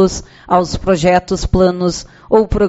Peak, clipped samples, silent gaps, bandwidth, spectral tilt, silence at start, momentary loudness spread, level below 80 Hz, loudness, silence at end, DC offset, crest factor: 0 dBFS; under 0.1%; none; 8.2 kHz; -6 dB/octave; 0 s; 7 LU; -28 dBFS; -14 LUFS; 0 s; under 0.1%; 14 dB